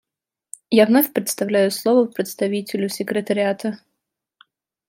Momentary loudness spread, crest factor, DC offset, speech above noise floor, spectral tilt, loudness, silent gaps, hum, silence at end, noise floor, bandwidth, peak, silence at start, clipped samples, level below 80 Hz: 13 LU; 18 dB; under 0.1%; 67 dB; -4.5 dB/octave; -20 LUFS; none; none; 1.15 s; -86 dBFS; 16.5 kHz; -2 dBFS; 0.7 s; under 0.1%; -72 dBFS